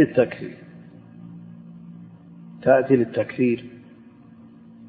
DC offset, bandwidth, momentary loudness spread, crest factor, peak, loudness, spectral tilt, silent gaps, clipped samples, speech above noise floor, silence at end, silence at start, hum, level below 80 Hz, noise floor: under 0.1%; 4.8 kHz; 26 LU; 20 dB; -4 dBFS; -21 LUFS; -11.5 dB/octave; none; under 0.1%; 27 dB; 1.1 s; 0 s; none; -64 dBFS; -47 dBFS